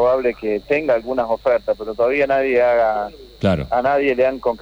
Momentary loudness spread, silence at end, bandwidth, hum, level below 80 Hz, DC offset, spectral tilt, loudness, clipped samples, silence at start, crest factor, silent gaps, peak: 7 LU; 0.05 s; over 20 kHz; none; -44 dBFS; under 0.1%; -7.5 dB/octave; -18 LUFS; under 0.1%; 0 s; 12 dB; none; -6 dBFS